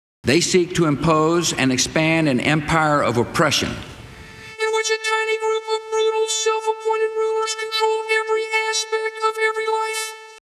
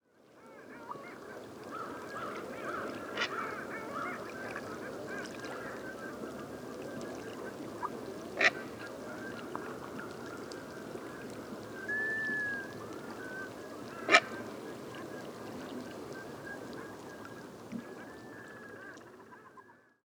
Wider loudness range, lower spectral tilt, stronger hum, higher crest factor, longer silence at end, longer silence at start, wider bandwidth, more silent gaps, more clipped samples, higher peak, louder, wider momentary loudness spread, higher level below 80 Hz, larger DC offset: second, 3 LU vs 12 LU; about the same, -3.5 dB/octave vs -3.5 dB/octave; neither; second, 16 dB vs 34 dB; about the same, 0.15 s vs 0.25 s; about the same, 0.25 s vs 0.15 s; second, 14.5 kHz vs over 20 kHz; neither; neither; about the same, -4 dBFS vs -6 dBFS; first, -19 LUFS vs -38 LUFS; second, 8 LU vs 15 LU; first, -48 dBFS vs -72 dBFS; neither